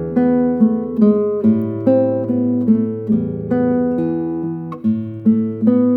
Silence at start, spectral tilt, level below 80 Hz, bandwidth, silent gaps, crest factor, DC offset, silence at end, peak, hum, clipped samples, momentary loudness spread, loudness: 0 s; -12 dB/octave; -54 dBFS; 3.2 kHz; none; 14 dB; under 0.1%; 0 s; -2 dBFS; none; under 0.1%; 6 LU; -17 LUFS